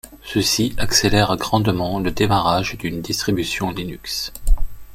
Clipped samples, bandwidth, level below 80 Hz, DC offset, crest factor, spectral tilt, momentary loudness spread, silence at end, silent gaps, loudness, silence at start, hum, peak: under 0.1%; 16.5 kHz; -26 dBFS; under 0.1%; 16 dB; -4 dB/octave; 9 LU; 0 s; none; -20 LUFS; 0.05 s; none; -2 dBFS